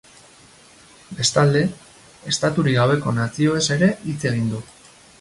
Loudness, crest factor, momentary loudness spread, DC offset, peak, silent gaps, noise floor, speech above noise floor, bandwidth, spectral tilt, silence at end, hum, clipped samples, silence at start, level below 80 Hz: -20 LUFS; 18 dB; 9 LU; under 0.1%; -4 dBFS; none; -49 dBFS; 29 dB; 11.5 kHz; -5 dB/octave; 0.55 s; none; under 0.1%; 1.1 s; -52 dBFS